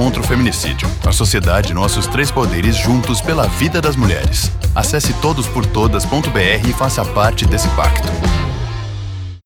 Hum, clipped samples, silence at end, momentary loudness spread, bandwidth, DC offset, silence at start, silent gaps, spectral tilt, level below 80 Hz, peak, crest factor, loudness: none; under 0.1%; 0.05 s; 4 LU; over 20 kHz; under 0.1%; 0 s; none; -4.5 dB/octave; -22 dBFS; 0 dBFS; 14 dB; -15 LUFS